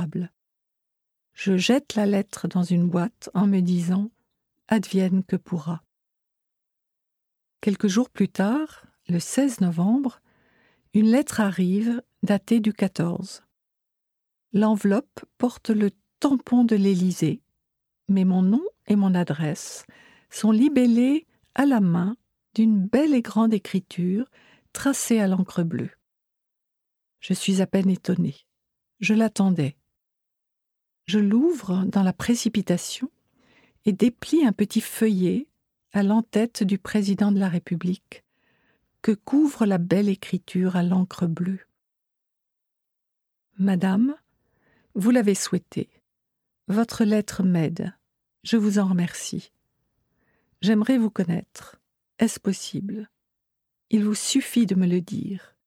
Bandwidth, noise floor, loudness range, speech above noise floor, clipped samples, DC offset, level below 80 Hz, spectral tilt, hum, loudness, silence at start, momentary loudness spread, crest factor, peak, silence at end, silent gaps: 15.5 kHz; -82 dBFS; 5 LU; 60 dB; under 0.1%; under 0.1%; -64 dBFS; -6 dB/octave; none; -23 LUFS; 0 s; 11 LU; 16 dB; -8 dBFS; 0.3 s; none